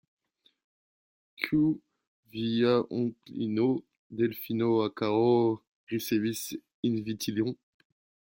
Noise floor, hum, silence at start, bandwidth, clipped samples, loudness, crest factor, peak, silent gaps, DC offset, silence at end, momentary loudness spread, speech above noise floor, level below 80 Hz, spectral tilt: under -90 dBFS; none; 1.4 s; 16.5 kHz; under 0.1%; -29 LUFS; 20 dB; -10 dBFS; 2.07-2.23 s, 3.97-4.10 s, 5.67-5.87 s, 6.74-6.83 s; under 0.1%; 0.8 s; 11 LU; over 62 dB; -68 dBFS; -6 dB/octave